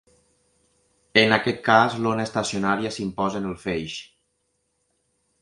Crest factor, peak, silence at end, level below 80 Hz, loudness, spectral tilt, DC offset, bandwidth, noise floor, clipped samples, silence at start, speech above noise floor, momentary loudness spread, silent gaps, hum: 24 dB; 0 dBFS; 1.35 s; -56 dBFS; -22 LUFS; -4.5 dB/octave; under 0.1%; 11.5 kHz; -73 dBFS; under 0.1%; 1.15 s; 50 dB; 11 LU; none; none